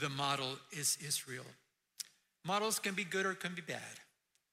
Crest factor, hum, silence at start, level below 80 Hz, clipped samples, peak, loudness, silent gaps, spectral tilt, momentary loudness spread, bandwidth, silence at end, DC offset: 20 dB; none; 0 s; -82 dBFS; under 0.1%; -20 dBFS; -38 LUFS; none; -2 dB/octave; 14 LU; 16 kHz; 0.5 s; under 0.1%